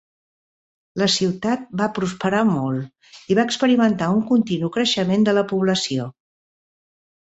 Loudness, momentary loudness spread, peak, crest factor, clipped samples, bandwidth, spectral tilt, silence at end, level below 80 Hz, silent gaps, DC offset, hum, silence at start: -20 LUFS; 8 LU; -4 dBFS; 18 dB; under 0.1%; 8.2 kHz; -5 dB/octave; 1.2 s; -60 dBFS; none; under 0.1%; none; 0.95 s